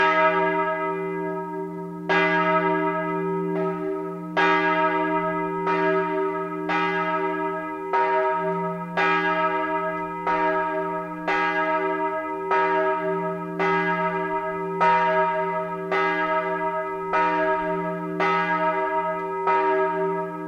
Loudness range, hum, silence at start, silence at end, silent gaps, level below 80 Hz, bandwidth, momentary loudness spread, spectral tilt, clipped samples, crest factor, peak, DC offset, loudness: 1 LU; none; 0 s; 0 s; none; -62 dBFS; 7.6 kHz; 8 LU; -6.5 dB/octave; under 0.1%; 18 dB; -6 dBFS; under 0.1%; -23 LUFS